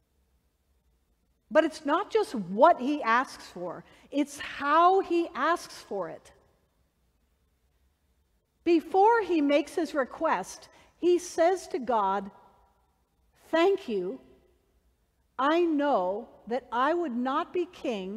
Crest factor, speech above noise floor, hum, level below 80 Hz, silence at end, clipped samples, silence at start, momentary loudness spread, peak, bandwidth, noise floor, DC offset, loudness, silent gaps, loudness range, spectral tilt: 22 dB; 45 dB; none; -68 dBFS; 0 s; under 0.1%; 1.5 s; 15 LU; -6 dBFS; 13.5 kHz; -71 dBFS; under 0.1%; -27 LUFS; none; 6 LU; -4.5 dB/octave